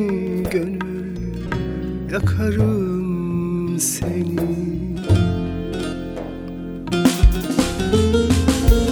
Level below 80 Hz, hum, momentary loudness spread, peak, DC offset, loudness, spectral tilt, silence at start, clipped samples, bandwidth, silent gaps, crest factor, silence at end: -26 dBFS; none; 11 LU; -2 dBFS; under 0.1%; -21 LUFS; -6 dB/octave; 0 s; under 0.1%; over 20 kHz; none; 18 dB; 0 s